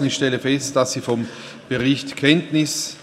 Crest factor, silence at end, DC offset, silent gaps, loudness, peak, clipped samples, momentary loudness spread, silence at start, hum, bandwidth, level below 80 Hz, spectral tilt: 20 dB; 0 s; under 0.1%; none; -20 LUFS; 0 dBFS; under 0.1%; 9 LU; 0 s; none; 15.5 kHz; -58 dBFS; -4 dB/octave